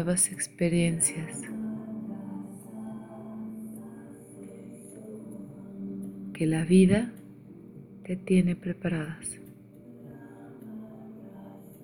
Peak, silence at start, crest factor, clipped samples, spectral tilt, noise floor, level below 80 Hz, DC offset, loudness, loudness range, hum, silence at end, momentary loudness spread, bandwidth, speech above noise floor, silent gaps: -8 dBFS; 0 s; 22 dB; under 0.1%; -5.5 dB/octave; -49 dBFS; -56 dBFS; under 0.1%; -28 LUFS; 15 LU; none; 0 s; 23 LU; 19 kHz; 23 dB; none